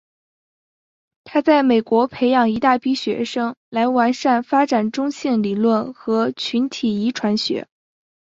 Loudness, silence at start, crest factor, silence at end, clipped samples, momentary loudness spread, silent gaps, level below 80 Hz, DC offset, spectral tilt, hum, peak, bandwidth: -19 LUFS; 1.25 s; 16 dB; 0.75 s; under 0.1%; 7 LU; 3.57-3.72 s; -62 dBFS; under 0.1%; -5.5 dB/octave; none; -2 dBFS; 7.8 kHz